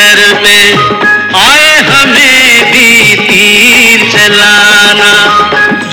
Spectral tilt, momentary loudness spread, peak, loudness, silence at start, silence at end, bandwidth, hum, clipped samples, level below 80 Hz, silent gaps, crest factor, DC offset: -1.5 dB/octave; 4 LU; 0 dBFS; -2 LUFS; 0 s; 0 s; over 20 kHz; none; 20%; -38 dBFS; none; 4 dB; under 0.1%